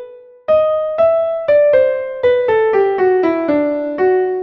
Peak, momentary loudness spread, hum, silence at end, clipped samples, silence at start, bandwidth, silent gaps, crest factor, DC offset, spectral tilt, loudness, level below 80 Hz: -2 dBFS; 4 LU; none; 0 s; under 0.1%; 0 s; 5.8 kHz; none; 12 dB; under 0.1%; -8 dB/octave; -14 LUFS; -52 dBFS